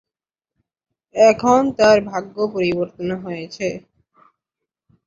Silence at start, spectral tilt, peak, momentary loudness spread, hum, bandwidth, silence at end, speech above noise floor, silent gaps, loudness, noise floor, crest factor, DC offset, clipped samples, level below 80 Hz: 1.15 s; -5 dB/octave; -2 dBFS; 14 LU; none; 7.6 kHz; 1.25 s; 71 dB; none; -18 LUFS; -89 dBFS; 18 dB; under 0.1%; under 0.1%; -56 dBFS